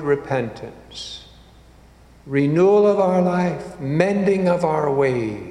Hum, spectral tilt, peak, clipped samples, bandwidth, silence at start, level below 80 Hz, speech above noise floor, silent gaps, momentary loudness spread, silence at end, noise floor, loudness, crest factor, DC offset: none; -7.5 dB/octave; -2 dBFS; under 0.1%; 10.5 kHz; 0 s; -50 dBFS; 29 dB; none; 18 LU; 0 s; -48 dBFS; -19 LUFS; 18 dB; under 0.1%